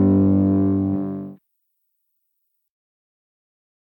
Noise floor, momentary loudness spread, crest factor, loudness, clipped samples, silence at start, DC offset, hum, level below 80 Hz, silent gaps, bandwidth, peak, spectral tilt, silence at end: -74 dBFS; 16 LU; 16 dB; -19 LUFS; under 0.1%; 0 s; under 0.1%; none; -64 dBFS; none; 2.4 kHz; -8 dBFS; -14 dB/octave; 2.45 s